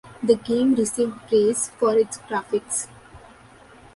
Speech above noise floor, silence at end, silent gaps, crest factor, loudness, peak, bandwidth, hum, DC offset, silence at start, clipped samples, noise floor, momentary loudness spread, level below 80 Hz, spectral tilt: 27 dB; 0.8 s; none; 18 dB; -22 LUFS; -4 dBFS; 11.5 kHz; none; under 0.1%; 0.05 s; under 0.1%; -49 dBFS; 8 LU; -58 dBFS; -4 dB/octave